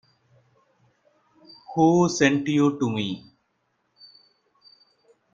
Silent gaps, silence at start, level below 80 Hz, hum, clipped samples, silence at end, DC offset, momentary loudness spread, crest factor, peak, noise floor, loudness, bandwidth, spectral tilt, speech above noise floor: none; 1.7 s; -66 dBFS; none; under 0.1%; 2.15 s; under 0.1%; 13 LU; 22 dB; -4 dBFS; -72 dBFS; -22 LUFS; 7.8 kHz; -5.5 dB/octave; 51 dB